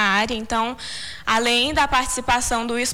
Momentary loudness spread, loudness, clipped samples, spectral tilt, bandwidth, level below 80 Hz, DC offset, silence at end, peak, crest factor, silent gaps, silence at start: 9 LU; -20 LUFS; under 0.1%; -2 dB/octave; 18.5 kHz; -40 dBFS; under 0.1%; 0 s; -8 dBFS; 12 dB; none; 0 s